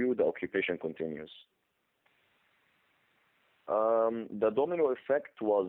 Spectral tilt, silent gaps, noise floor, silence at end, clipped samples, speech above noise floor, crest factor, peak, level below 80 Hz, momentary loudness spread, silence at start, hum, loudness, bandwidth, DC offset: -9 dB/octave; none; -75 dBFS; 0 s; under 0.1%; 44 dB; 16 dB; -18 dBFS; -76 dBFS; 11 LU; 0 s; none; -31 LUFS; 4 kHz; under 0.1%